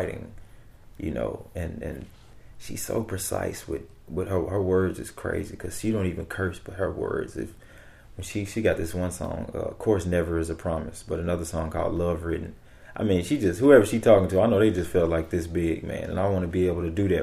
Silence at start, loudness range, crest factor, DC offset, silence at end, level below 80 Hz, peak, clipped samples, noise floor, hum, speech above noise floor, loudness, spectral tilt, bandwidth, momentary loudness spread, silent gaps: 0 s; 10 LU; 22 dB; under 0.1%; 0 s; -44 dBFS; -4 dBFS; under 0.1%; -48 dBFS; none; 23 dB; -26 LUFS; -6.5 dB/octave; 15.5 kHz; 15 LU; none